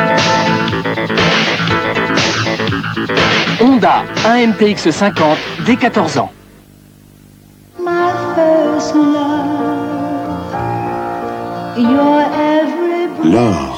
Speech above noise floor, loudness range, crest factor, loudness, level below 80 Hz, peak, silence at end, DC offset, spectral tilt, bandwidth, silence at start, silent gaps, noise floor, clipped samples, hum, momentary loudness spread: 30 dB; 4 LU; 14 dB; -13 LUFS; -44 dBFS; 0 dBFS; 0 s; under 0.1%; -5 dB/octave; 16 kHz; 0 s; none; -41 dBFS; under 0.1%; none; 9 LU